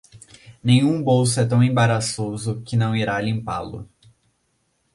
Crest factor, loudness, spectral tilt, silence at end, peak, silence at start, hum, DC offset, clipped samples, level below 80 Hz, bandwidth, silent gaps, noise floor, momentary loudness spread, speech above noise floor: 18 dB; -20 LUFS; -5.5 dB/octave; 1.1 s; -4 dBFS; 0.15 s; none; under 0.1%; under 0.1%; -52 dBFS; 11.5 kHz; none; -68 dBFS; 11 LU; 49 dB